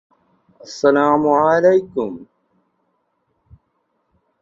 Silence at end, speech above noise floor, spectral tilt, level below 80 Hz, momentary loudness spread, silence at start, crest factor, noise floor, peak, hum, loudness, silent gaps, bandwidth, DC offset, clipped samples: 2.2 s; 53 dB; -6 dB/octave; -60 dBFS; 17 LU; 0.7 s; 18 dB; -68 dBFS; -2 dBFS; none; -16 LUFS; none; 7.6 kHz; under 0.1%; under 0.1%